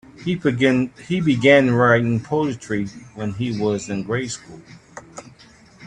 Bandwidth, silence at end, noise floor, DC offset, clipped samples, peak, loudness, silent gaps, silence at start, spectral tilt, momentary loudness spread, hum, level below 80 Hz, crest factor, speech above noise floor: 10.5 kHz; 0 s; -48 dBFS; under 0.1%; under 0.1%; 0 dBFS; -20 LUFS; none; 0.2 s; -6 dB/octave; 18 LU; none; -54 dBFS; 20 dB; 29 dB